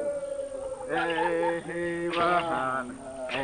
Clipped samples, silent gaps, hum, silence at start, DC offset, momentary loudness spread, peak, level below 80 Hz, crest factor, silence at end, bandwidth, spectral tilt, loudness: under 0.1%; none; none; 0 s; under 0.1%; 11 LU; -14 dBFS; -58 dBFS; 16 dB; 0 s; 10 kHz; -4.5 dB/octave; -29 LUFS